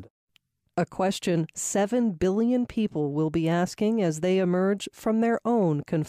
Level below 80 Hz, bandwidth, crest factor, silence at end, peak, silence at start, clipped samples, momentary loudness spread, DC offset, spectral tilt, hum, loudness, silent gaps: -56 dBFS; 15.5 kHz; 10 dB; 0 s; -14 dBFS; 0 s; under 0.1%; 4 LU; under 0.1%; -6 dB/octave; none; -26 LUFS; 0.10-0.27 s